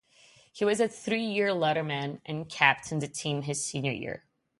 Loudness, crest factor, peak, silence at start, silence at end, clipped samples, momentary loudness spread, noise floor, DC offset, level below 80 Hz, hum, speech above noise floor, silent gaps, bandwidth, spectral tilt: -29 LUFS; 24 dB; -6 dBFS; 0.55 s; 0.4 s; under 0.1%; 13 LU; -60 dBFS; under 0.1%; -68 dBFS; none; 30 dB; none; 11.5 kHz; -4 dB/octave